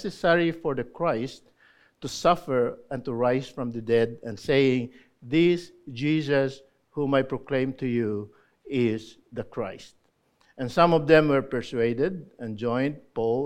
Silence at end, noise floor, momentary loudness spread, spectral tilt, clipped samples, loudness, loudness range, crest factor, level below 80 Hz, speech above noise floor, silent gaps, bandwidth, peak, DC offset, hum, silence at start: 0 s; -66 dBFS; 14 LU; -6.5 dB/octave; under 0.1%; -26 LUFS; 4 LU; 22 dB; -56 dBFS; 41 dB; none; 13 kHz; -4 dBFS; under 0.1%; none; 0 s